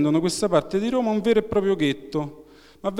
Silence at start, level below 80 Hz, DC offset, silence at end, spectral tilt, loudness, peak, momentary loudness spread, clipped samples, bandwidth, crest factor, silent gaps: 0 s; -52 dBFS; under 0.1%; 0 s; -5.5 dB/octave; -23 LUFS; -6 dBFS; 9 LU; under 0.1%; 15 kHz; 18 dB; none